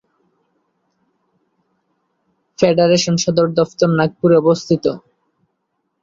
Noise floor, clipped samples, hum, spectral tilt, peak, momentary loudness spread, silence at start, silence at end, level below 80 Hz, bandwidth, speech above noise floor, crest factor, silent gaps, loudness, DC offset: -71 dBFS; under 0.1%; none; -5.5 dB/octave; -2 dBFS; 5 LU; 2.6 s; 1.05 s; -56 dBFS; 7.8 kHz; 57 dB; 16 dB; none; -15 LUFS; under 0.1%